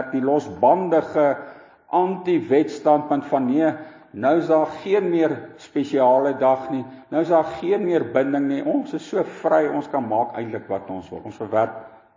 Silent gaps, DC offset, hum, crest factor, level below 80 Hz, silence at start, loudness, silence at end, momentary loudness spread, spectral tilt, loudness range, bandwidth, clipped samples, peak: none; under 0.1%; none; 18 dB; -64 dBFS; 0 s; -21 LUFS; 0.3 s; 11 LU; -7.5 dB/octave; 3 LU; 7.6 kHz; under 0.1%; -4 dBFS